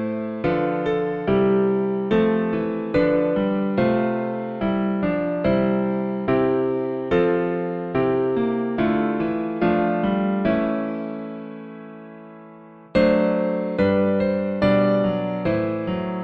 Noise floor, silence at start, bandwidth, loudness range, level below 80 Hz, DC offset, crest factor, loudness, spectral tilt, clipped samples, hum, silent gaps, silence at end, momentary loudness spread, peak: -44 dBFS; 0 s; 5.4 kHz; 4 LU; -48 dBFS; under 0.1%; 16 dB; -22 LUFS; -9.5 dB/octave; under 0.1%; none; none; 0 s; 7 LU; -6 dBFS